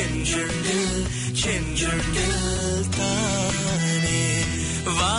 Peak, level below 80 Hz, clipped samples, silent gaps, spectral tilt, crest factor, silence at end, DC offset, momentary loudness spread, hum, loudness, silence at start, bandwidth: -10 dBFS; -34 dBFS; under 0.1%; none; -3.5 dB/octave; 12 dB; 0 s; under 0.1%; 3 LU; none; -23 LUFS; 0 s; 11 kHz